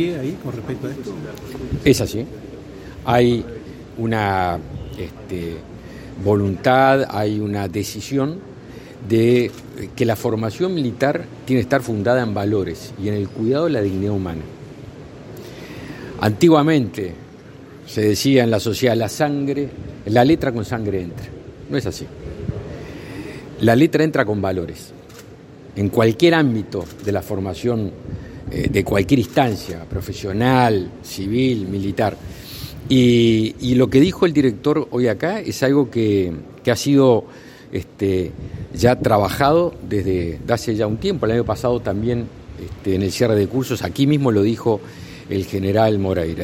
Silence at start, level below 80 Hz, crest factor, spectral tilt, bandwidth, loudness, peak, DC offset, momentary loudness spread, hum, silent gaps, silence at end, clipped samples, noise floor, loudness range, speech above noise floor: 0 s; -44 dBFS; 18 dB; -6.5 dB/octave; 16.5 kHz; -19 LUFS; 0 dBFS; under 0.1%; 18 LU; none; none; 0 s; under 0.1%; -40 dBFS; 4 LU; 22 dB